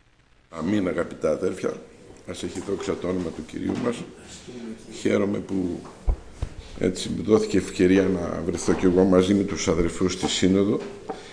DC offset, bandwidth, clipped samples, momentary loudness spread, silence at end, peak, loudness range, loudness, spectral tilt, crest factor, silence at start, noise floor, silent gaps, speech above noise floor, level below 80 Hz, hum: under 0.1%; 10.5 kHz; under 0.1%; 18 LU; 0 s; -6 dBFS; 8 LU; -24 LUFS; -5.5 dB/octave; 18 dB; 0.5 s; -58 dBFS; none; 34 dB; -40 dBFS; none